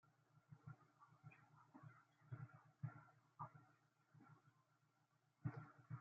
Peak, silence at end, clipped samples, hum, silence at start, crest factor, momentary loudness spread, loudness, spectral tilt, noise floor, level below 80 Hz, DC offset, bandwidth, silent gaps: -36 dBFS; 0 s; under 0.1%; none; 0.05 s; 24 dB; 13 LU; -60 LUFS; -8.5 dB/octave; -83 dBFS; -90 dBFS; under 0.1%; 7 kHz; none